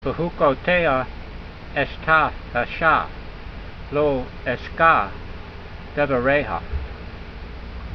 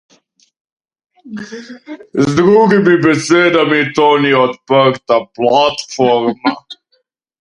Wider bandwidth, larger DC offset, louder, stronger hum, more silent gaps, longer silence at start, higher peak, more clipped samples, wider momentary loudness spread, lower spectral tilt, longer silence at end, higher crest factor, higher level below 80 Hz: second, 6.4 kHz vs 11 kHz; neither; second, -21 LUFS vs -12 LUFS; neither; neither; second, 0 s vs 1.25 s; second, -4 dBFS vs 0 dBFS; neither; about the same, 19 LU vs 19 LU; first, -8 dB/octave vs -5.5 dB/octave; second, 0 s vs 0.65 s; first, 20 dB vs 14 dB; first, -36 dBFS vs -52 dBFS